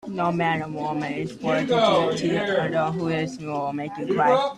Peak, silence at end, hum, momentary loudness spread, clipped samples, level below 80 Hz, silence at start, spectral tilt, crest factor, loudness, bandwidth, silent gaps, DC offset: -6 dBFS; 0 s; none; 9 LU; under 0.1%; -60 dBFS; 0.05 s; -6 dB/octave; 18 dB; -24 LUFS; 11 kHz; none; under 0.1%